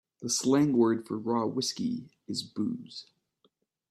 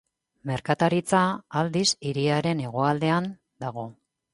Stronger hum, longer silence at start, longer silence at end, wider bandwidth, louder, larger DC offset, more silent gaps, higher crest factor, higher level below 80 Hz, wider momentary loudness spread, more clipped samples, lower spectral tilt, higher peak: neither; second, 0.2 s vs 0.45 s; first, 0.9 s vs 0.4 s; first, 14 kHz vs 11.5 kHz; second, -29 LUFS vs -25 LUFS; neither; neither; about the same, 18 dB vs 18 dB; second, -72 dBFS vs -62 dBFS; about the same, 15 LU vs 13 LU; neither; about the same, -4.5 dB/octave vs -5 dB/octave; second, -12 dBFS vs -8 dBFS